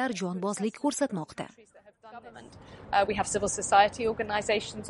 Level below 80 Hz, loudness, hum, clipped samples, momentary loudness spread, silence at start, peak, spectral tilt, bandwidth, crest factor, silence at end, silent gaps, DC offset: -56 dBFS; -28 LUFS; none; under 0.1%; 26 LU; 0 s; -8 dBFS; -3.5 dB/octave; 11.5 kHz; 22 dB; 0 s; none; under 0.1%